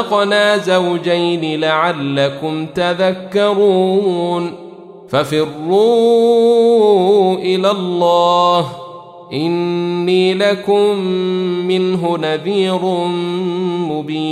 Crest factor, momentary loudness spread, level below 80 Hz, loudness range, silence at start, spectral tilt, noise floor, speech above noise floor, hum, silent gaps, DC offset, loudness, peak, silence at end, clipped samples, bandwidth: 12 dB; 8 LU; -62 dBFS; 4 LU; 0 s; -6 dB/octave; -35 dBFS; 21 dB; none; none; under 0.1%; -14 LUFS; -2 dBFS; 0 s; under 0.1%; 13.5 kHz